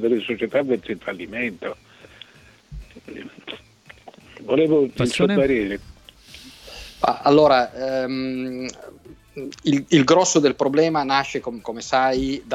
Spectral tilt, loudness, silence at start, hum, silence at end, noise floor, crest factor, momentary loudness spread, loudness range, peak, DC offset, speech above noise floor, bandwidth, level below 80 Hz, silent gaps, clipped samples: -4.5 dB/octave; -20 LUFS; 0 s; none; 0 s; -50 dBFS; 18 dB; 23 LU; 11 LU; -4 dBFS; under 0.1%; 31 dB; 13.5 kHz; -50 dBFS; none; under 0.1%